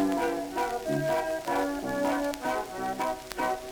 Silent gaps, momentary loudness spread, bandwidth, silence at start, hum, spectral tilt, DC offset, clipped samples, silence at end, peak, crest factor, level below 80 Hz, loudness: none; 4 LU; over 20 kHz; 0 s; none; -5 dB/octave; under 0.1%; under 0.1%; 0 s; -10 dBFS; 20 dB; -54 dBFS; -30 LUFS